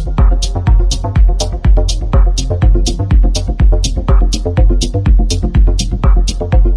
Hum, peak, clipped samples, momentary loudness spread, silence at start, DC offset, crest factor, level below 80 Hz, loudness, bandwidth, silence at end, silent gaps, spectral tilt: none; 0 dBFS; under 0.1%; 2 LU; 0 s; under 0.1%; 10 dB; -10 dBFS; -13 LUFS; 10.5 kHz; 0 s; none; -5.5 dB/octave